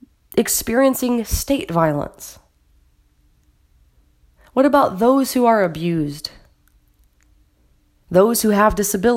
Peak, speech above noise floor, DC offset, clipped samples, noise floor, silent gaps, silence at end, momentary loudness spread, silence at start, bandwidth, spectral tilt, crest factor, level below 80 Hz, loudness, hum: -2 dBFS; 41 dB; under 0.1%; under 0.1%; -58 dBFS; none; 0 s; 11 LU; 0.35 s; 16.5 kHz; -4.5 dB/octave; 18 dB; -38 dBFS; -17 LUFS; none